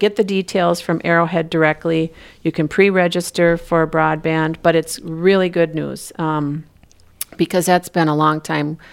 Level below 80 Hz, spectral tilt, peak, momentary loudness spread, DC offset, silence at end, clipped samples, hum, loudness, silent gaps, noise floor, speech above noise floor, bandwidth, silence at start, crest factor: -48 dBFS; -5.5 dB/octave; 0 dBFS; 10 LU; under 0.1%; 0.15 s; under 0.1%; none; -17 LUFS; none; -49 dBFS; 32 dB; 16.5 kHz; 0 s; 16 dB